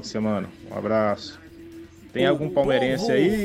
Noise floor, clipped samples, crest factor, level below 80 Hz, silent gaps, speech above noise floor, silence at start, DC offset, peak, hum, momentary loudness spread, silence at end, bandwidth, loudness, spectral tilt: -43 dBFS; under 0.1%; 16 dB; -50 dBFS; none; 20 dB; 0 s; under 0.1%; -8 dBFS; none; 22 LU; 0 s; 15.5 kHz; -24 LUFS; -6 dB/octave